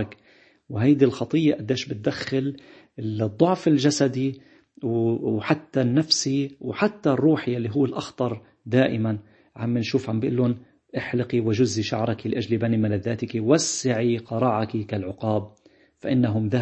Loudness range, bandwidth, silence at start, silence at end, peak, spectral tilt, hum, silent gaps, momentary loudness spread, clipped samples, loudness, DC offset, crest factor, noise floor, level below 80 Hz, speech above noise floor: 2 LU; 8.6 kHz; 0 s; 0 s; -4 dBFS; -5.5 dB/octave; none; none; 11 LU; under 0.1%; -24 LUFS; under 0.1%; 20 dB; -57 dBFS; -62 dBFS; 34 dB